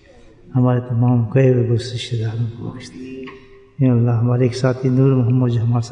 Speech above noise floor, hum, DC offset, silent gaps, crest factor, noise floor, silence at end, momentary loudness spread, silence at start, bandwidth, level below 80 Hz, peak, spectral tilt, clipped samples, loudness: 28 dB; none; under 0.1%; none; 14 dB; -45 dBFS; 0 s; 17 LU; 0.45 s; 9.4 kHz; -50 dBFS; -4 dBFS; -8.5 dB/octave; under 0.1%; -17 LUFS